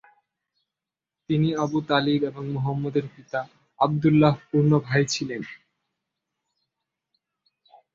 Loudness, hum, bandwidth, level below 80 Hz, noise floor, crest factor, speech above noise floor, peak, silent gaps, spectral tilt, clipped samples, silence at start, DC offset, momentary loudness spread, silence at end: -24 LUFS; none; 7.6 kHz; -62 dBFS; -89 dBFS; 22 dB; 66 dB; -4 dBFS; none; -6.5 dB/octave; under 0.1%; 1.3 s; under 0.1%; 12 LU; 2.4 s